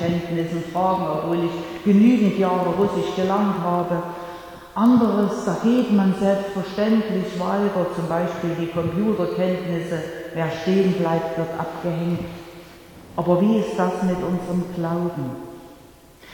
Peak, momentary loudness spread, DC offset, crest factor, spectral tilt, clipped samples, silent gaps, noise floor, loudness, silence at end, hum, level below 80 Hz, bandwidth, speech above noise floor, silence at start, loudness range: -6 dBFS; 12 LU; under 0.1%; 16 dB; -7.5 dB/octave; under 0.1%; none; -47 dBFS; -22 LUFS; 0 s; none; -52 dBFS; 18.5 kHz; 26 dB; 0 s; 4 LU